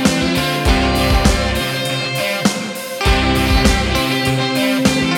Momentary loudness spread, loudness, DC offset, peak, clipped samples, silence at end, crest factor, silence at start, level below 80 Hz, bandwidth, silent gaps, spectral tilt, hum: 4 LU; -16 LUFS; under 0.1%; 0 dBFS; under 0.1%; 0 s; 16 dB; 0 s; -22 dBFS; 18 kHz; none; -4.5 dB/octave; none